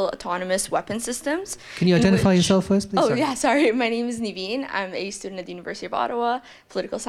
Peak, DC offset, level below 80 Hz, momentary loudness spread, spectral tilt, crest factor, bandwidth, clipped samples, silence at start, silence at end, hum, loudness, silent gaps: -6 dBFS; under 0.1%; -50 dBFS; 14 LU; -5 dB/octave; 16 dB; 14 kHz; under 0.1%; 0 s; 0 s; none; -23 LUFS; none